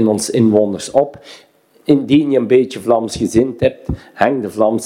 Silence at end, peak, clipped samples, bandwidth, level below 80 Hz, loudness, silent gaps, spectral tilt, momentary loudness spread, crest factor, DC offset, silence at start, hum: 0 s; 0 dBFS; under 0.1%; 15.5 kHz; -42 dBFS; -15 LUFS; none; -6 dB/octave; 6 LU; 14 dB; under 0.1%; 0 s; none